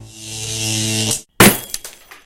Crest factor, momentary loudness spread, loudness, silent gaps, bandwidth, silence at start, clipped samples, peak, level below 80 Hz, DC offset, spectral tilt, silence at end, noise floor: 18 dB; 18 LU; -15 LUFS; none; 17 kHz; 0 s; under 0.1%; 0 dBFS; -40 dBFS; under 0.1%; -3 dB/octave; 0.1 s; -36 dBFS